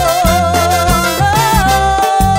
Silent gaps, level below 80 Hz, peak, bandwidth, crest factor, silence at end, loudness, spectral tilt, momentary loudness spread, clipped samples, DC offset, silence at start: none; -22 dBFS; 0 dBFS; 16.5 kHz; 10 dB; 0 s; -11 LUFS; -4 dB/octave; 1 LU; under 0.1%; under 0.1%; 0 s